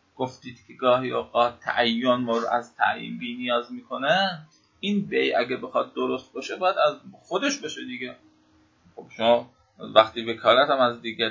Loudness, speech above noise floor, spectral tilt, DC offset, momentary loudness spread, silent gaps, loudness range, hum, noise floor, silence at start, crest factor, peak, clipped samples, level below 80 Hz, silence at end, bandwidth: -24 LUFS; 36 dB; -4 dB/octave; under 0.1%; 14 LU; none; 4 LU; none; -61 dBFS; 0.2 s; 24 dB; 0 dBFS; under 0.1%; -66 dBFS; 0 s; 7.6 kHz